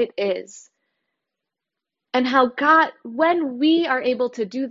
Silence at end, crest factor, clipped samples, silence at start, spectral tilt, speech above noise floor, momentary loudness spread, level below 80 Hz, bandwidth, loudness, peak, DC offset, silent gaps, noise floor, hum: 0 s; 18 dB; under 0.1%; 0 s; -4.5 dB/octave; 65 dB; 9 LU; -70 dBFS; 7.8 kHz; -20 LUFS; -2 dBFS; under 0.1%; none; -85 dBFS; none